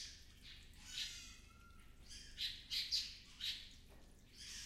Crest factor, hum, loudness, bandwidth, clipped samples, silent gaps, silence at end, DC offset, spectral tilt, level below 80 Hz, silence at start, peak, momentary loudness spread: 24 dB; none; -44 LUFS; 16 kHz; under 0.1%; none; 0 s; under 0.1%; 0 dB/octave; -62 dBFS; 0 s; -26 dBFS; 23 LU